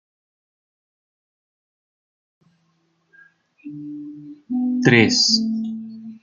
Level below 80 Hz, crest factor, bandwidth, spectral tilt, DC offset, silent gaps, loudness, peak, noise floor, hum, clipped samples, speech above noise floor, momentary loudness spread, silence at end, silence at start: -66 dBFS; 22 dB; 7.6 kHz; -4 dB/octave; under 0.1%; none; -17 LUFS; -2 dBFS; -66 dBFS; none; under 0.1%; 47 dB; 23 LU; 0.05 s; 3.65 s